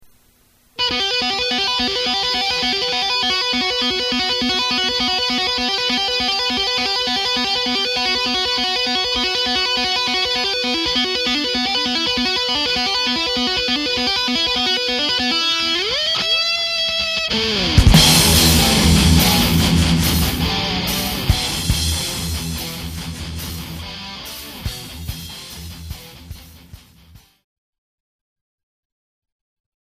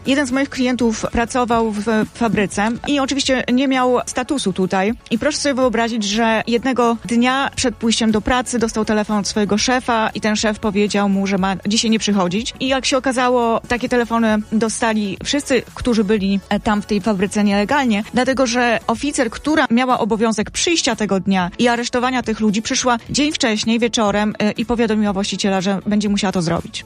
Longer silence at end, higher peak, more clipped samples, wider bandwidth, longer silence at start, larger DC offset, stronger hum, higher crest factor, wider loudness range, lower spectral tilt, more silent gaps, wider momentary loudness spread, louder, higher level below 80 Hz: first, 3.1 s vs 0 s; about the same, 0 dBFS vs -2 dBFS; neither; first, 15.5 kHz vs 12.5 kHz; first, 0.8 s vs 0 s; neither; neither; about the same, 18 dB vs 16 dB; first, 16 LU vs 1 LU; about the same, -3 dB/octave vs -4 dB/octave; neither; first, 16 LU vs 3 LU; about the same, -16 LUFS vs -17 LUFS; first, -30 dBFS vs -42 dBFS